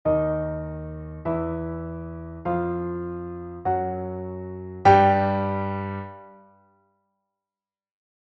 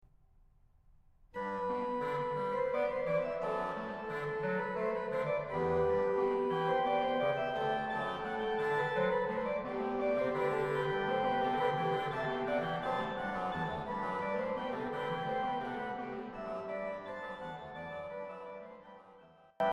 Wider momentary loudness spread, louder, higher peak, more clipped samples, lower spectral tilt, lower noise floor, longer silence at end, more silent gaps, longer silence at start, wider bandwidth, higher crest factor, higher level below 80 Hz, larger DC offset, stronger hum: first, 18 LU vs 11 LU; first, -25 LUFS vs -35 LUFS; first, -4 dBFS vs -20 dBFS; neither; about the same, -6.5 dB/octave vs -7 dB/octave; first, under -90 dBFS vs -65 dBFS; first, 1.85 s vs 0 s; neither; second, 0.05 s vs 1.35 s; second, 7.2 kHz vs 10 kHz; first, 22 dB vs 16 dB; first, -46 dBFS vs -62 dBFS; neither; neither